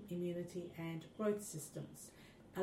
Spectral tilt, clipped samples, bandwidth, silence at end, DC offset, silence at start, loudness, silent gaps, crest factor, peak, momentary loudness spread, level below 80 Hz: -5.5 dB/octave; under 0.1%; 16 kHz; 0 s; under 0.1%; 0 s; -45 LUFS; none; 18 dB; -26 dBFS; 15 LU; -76 dBFS